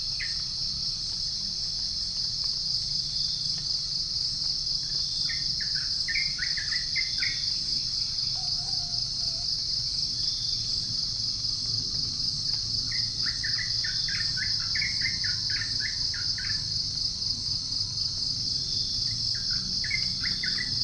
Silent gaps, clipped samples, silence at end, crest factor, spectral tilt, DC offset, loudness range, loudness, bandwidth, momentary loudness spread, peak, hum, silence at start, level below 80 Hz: none; under 0.1%; 0 s; 14 dB; -0.5 dB/octave; under 0.1%; 1 LU; -26 LUFS; 10.5 kHz; 2 LU; -14 dBFS; none; 0 s; -48 dBFS